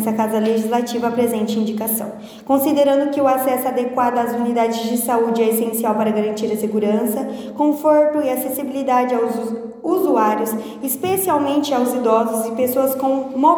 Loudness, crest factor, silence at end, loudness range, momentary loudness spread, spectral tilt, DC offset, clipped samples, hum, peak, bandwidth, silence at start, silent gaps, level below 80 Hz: -18 LUFS; 16 dB; 0 s; 1 LU; 6 LU; -5 dB/octave; under 0.1%; under 0.1%; none; -2 dBFS; over 20 kHz; 0 s; none; -64 dBFS